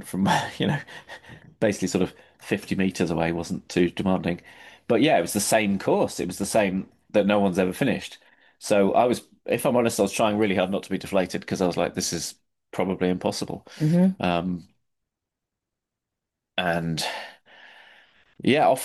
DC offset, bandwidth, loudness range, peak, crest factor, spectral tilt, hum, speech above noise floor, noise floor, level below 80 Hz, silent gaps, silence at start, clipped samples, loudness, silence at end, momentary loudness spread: under 0.1%; 12.5 kHz; 5 LU; -8 dBFS; 16 dB; -5 dB/octave; none; 61 dB; -85 dBFS; -56 dBFS; none; 0 s; under 0.1%; -24 LUFS; 0 s; 11 LU